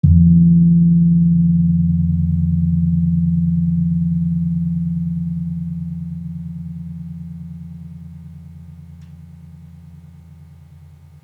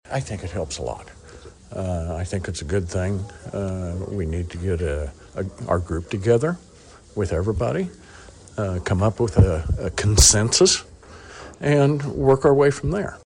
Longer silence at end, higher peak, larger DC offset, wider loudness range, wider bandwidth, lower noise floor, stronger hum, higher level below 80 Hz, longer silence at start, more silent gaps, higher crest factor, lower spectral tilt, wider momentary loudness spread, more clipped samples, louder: first, 0.8 s vs 0.1 s; about the same, -2 dBFS vs -4 dBFS; neither; first, 22 LU vs 10 LU; second, 0.8 kHz vs 10.5 kHz; about the same, -42 dBFS vs -44 dBFS; neither; about the same, -38 dBFS vs -34 dBFS; about the same, 0.05 s vs 0.1 s; neither; about the same, 16 dB vs 18 dB; first, -13 dB/octave vs -4.5 dB/octave; first, 23 LU vs 16 LU; neither; first, -16 LUFS vs -22 LUFS